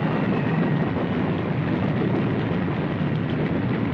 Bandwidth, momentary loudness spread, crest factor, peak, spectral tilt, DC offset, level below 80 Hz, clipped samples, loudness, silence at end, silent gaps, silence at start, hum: 5.8 kHz; 2 LU; 12 dB; -12 dBFS; -9.5 dB/octave; under 0.1%; -48 dBFS; under 0.1%; -24 LUFS; 0 s; none; 0 s; none